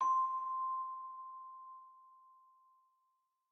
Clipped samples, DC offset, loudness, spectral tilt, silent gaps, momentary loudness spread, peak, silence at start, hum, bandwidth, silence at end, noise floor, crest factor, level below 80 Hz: under 0.1%; under 0.1%; -39 LUFS; -1 dB/octave; none; 21 LU; -26 dBFS; 0 s; none; 6.2 kHz; 1.2 s; -82 dBFS; 16 dB; under -90 dBFS